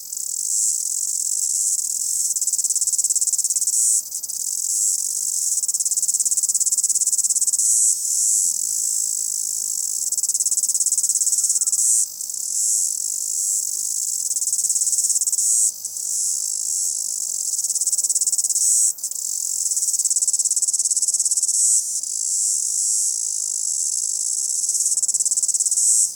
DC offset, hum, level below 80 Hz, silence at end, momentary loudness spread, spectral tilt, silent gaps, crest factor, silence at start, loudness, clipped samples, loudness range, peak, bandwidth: under 0.1%; none; -78 dBFS; 0 s; 6 LU; 4 dB/octave; none; 18 dB; 0 s; -18 LUFS; under 0.1%; 2 LU; -2 dBFS; over 20 kHz